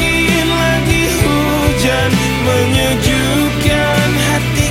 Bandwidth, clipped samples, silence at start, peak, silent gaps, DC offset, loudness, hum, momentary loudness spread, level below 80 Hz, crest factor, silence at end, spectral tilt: 16.5 kHz; under 0.1%; 0 s; 0 dBFS; none; under 0.1%; -13 LUFS; none; 1 LU; -24 dBFS; 12 dB; 0 s; -4.5 dB/octave